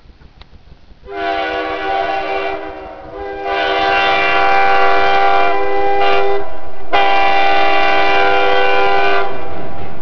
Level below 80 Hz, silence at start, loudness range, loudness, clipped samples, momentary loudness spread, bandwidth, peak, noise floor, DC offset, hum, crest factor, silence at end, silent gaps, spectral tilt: -42 dBFS; 0 s; 7 LU; -14 LUFS; under 0.1%; 15 LU; 5.4 kHz; 0 dBFS; -41 dBFS; 20%; none; 12 dB; 0 s; none; -4.5 dB/octave